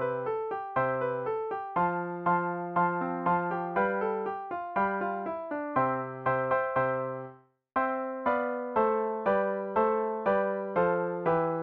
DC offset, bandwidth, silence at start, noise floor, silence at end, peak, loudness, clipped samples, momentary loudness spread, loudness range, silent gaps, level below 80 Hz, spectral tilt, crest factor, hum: under 0.1%; 4.6 kHz; 0 s; -52 dBFS; 0 s; -14 dBFS; -30 LUFS; under 0.1%; 6 LU; 2 LU; none; -66 dBFS; -10 dB/octave; 16 dB; none